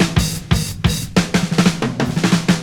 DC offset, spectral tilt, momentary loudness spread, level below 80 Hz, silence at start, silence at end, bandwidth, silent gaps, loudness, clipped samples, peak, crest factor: under 0.1%; -5 dB/octave; 4 LU; -30 dBFS; 0 s; 0 s; 19.5 kHz; none; -17 LUFS; under 0.1%; 0 dBFS; 16 dB